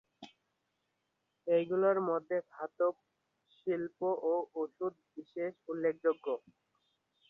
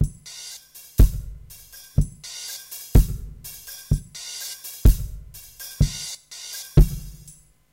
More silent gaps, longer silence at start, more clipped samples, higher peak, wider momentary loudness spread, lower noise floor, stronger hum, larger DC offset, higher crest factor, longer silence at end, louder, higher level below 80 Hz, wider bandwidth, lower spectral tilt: neither; first, 0.2 s vs 0 s; neither; second, -18 dBFS vs -6 dBFS; second, 13 LU vs 20 LU; first, -83 dBFS vs -50 dBFS; neither; neither; about the same, 18 dB vs 18 dB; first, 0.9 s vs 0.65 s; second, -35 LUFS vs -25 LUFS; second, -84 dBFS vs -24 dBFS; second, 5.4 kHz vs 17 kHz; first, -8.5 dB/octave vs -5.5 dB/octave